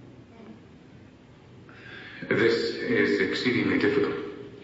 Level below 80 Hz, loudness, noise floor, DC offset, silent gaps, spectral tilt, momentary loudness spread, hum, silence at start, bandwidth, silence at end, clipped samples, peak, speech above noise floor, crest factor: -62 dBFS; -25 LUFS; -51 dBFS; under 0.1%; none; -6 dB/octave; 21 LU; none; 0 s; 8 kHz; 0 s; under 0.1%; -10 dBFS; 26 dB; 18 dB